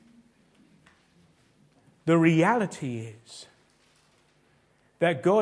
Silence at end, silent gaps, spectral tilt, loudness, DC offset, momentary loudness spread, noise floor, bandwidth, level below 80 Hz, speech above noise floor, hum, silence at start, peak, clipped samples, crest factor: 0 s; none; -7 dB/octave; -25 LUFS; under 0.1%; 24 LU; -65 dBFS; 10.5 kHz; -74 dBFS; 41 dB; none; 2.05 s; -8 dBFS; under 0.1%; 20 dB